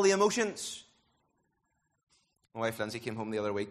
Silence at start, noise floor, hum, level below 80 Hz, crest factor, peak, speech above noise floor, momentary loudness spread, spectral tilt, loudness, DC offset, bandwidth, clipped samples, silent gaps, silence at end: 0 s; -79 dBFS; none; -72 dBFS; 20 dB; -14 dBFS; 48 dB; 14 LU; -3.5 dB/octave; -33 LUFS; under 0.1%; 13 kHz; under 0.1%; 2.03-2.07 s; 0 s